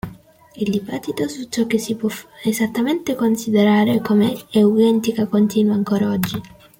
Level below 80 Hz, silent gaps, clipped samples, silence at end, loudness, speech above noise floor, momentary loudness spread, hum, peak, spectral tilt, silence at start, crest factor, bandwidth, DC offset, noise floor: -54 dBFS; none; under 0.1%; 0.35 s; -19 LUFS; 25 dB; 10 LU; none; -4 dBFS; -6 dB/octave; 0.05 s; 14 dB; 17 kHz; under 0.1%; -42 dBFS